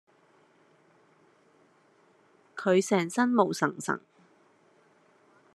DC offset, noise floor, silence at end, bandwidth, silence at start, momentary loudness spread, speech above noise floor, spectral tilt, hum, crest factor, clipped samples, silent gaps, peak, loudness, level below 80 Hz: under 0.1%; -64 dBFS; 1.55 s; 13 kHz; 2.55 s; 10 LU; 37 dB; -5 dB/octave; none; 24 dB; under 0.1%; none; -8 dBFS; -27 LUFS; -82 dBFS